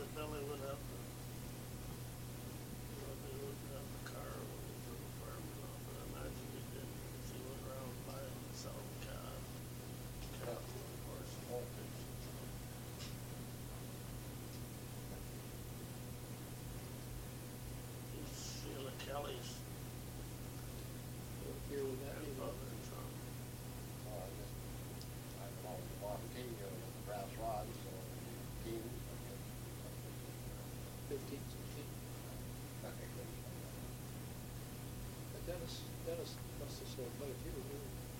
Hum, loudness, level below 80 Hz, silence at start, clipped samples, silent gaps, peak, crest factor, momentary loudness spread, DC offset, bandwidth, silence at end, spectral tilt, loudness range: none; -48 LUFS; -58 dBFS; 0 s; under 0.1%; none; -30 dBFS; 16 dB; 4 LU; under 0.1%; 16.5 kHz; 0 s; -5 dB/octave; 2 LU